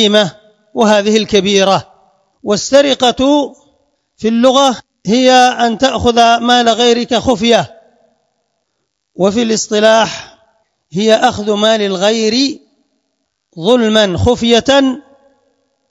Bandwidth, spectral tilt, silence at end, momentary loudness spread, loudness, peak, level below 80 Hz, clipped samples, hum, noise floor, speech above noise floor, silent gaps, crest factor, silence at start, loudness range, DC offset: 12 kHz; -4 dB/octave; 0.9 s; 9 LU; -11 LUFS; 0 dBFS; -44 dBFS; 0.3%; none; -69 dBFS; 59 dB; none; 12 dB; 0 s; 4 LU; under 0.1%